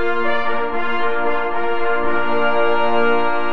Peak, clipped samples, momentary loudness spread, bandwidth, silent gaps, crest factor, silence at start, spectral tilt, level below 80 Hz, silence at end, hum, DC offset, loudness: -4 dBFS; under 0.1%; 4 LU; 6.6 kHz; none; 12 dB; 0 s; -6.5 dB/octave; -46 dBFS; 0 s; none; 10%; -19 LUFS